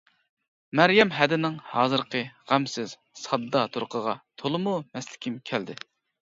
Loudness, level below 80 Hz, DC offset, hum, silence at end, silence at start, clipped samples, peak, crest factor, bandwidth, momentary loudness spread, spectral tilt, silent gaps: -26 LUFS; -72 dBFS; under 0.1%; none; 0.45 s; 0.75 s; under 0.1%; -2 dBFS; 24 dB; 7.8 kHz; 15 LU; -5 dB/octave; none